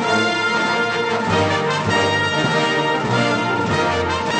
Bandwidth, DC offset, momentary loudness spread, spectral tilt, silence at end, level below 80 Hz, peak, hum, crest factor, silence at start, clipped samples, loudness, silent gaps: 9.2 kHz; under 0.1%; 2 LU; -4.5 dB/octave; 0 s; -48 dBFS; -4 dBFS; none; 14 dB; 0 s; under 0.1%; -18 LUFS; none